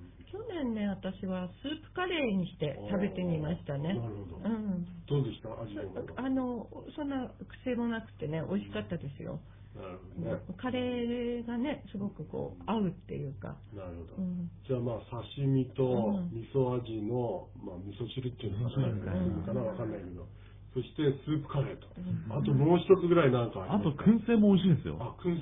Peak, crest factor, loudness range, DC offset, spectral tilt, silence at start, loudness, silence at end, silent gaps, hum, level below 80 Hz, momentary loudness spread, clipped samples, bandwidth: -12 dBFS; 20 dB; 9 LU; under 0.1%; -11.5 dB/octave; 0 s; -33 LUFS; 0 s; none; none; -56 dBFS; 16 LU; under 0.1%; 3.9 kHz